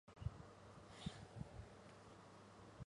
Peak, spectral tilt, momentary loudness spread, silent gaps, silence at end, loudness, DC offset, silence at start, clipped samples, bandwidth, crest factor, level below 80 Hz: -32 dBFS; -6 dB/octave; 9 LU; none; 0 s; -57 LUFS; under 0.1%; 0.05 s; under 0.1%; 11 kHz; 24 dB; -64 dBFS